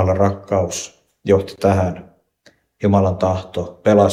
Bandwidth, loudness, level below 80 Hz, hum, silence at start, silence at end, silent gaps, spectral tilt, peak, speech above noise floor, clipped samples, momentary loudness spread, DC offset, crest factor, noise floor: 13 kHz; -18 LUFS; -48 dBFS; none; 0 s; 0 s; none; -6.5 dB/octave; 0 dBFS; 39 dB; under 0.1%; 12 LU; under 0.1%; 18 dB; -55 dBFS